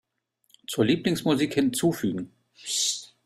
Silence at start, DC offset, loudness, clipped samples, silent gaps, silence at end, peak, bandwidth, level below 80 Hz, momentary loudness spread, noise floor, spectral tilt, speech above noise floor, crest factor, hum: 0.7 s; under 0.1%; -25 LUFS; under 0.1%; none; 0.2 s; -8 dBFS; 16 kHz; -62 dBFS; 15 LU; -71 dBFS; -4 dB/octave; 46 dB; 18 dB; none